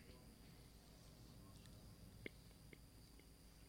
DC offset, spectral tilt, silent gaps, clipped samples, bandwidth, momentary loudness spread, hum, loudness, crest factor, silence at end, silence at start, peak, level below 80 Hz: under 0.1%; -4.5 dB/octave; none; under 0.1%; 16.5 kHz; 7 LU; none; -63 LUFS; 28 dB; 0 s; 0 s; -34 dBFS; -68 dBFS